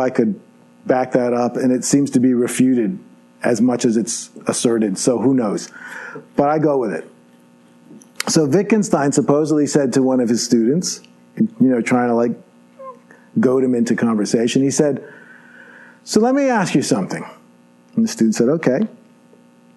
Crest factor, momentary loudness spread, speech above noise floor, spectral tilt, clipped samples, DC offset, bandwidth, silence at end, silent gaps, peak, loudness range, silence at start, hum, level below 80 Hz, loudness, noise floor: 16 dB; 13 LU; 33 dB; -5 dB/octave; under 0.1%; under 0.1%; 12 kHz; 0.85 s; none; 0 dBFS; 3 LU; 0 s; 60 Hz at -45 dBFS; -62 dBFS; -17 LUFS; -50 dBFS